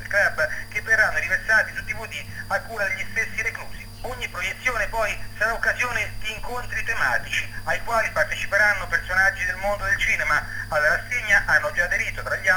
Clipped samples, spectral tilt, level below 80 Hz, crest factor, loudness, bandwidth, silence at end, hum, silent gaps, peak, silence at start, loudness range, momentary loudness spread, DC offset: under 0.1%; -2.5 dB/octave; -40 dBFS; 18 dB; -22 LUFS; 19 kHz; 0 s; none; none; -6 dBFS; 0 s; 5 LU; 11 LU; under 0.1%